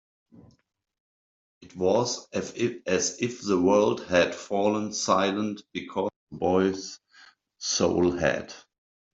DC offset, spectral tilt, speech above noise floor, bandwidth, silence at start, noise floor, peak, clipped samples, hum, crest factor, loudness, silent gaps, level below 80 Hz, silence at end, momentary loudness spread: under 0.1%; -4 dB/octave; 43 dB; 8 kHz; 1.6 s; -68 dBFS; -6 dBFS; under 0.1%; none; 22 dB; -26 LUFS; 6.16-6.27 s; -62 dBFS; 0.55 s; 12 LU